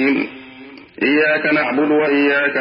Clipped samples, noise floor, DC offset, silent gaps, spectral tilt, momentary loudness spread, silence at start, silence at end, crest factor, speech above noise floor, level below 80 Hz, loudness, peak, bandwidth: under 0.1%; -39 dBFS; under 0.1%; none; -10 dB/octave; 7 LU; 0 s; 0 s; 14 dB; 23 dB; -64 dBFS; -16 LUFS; -2 dBFS; 5.6 kHz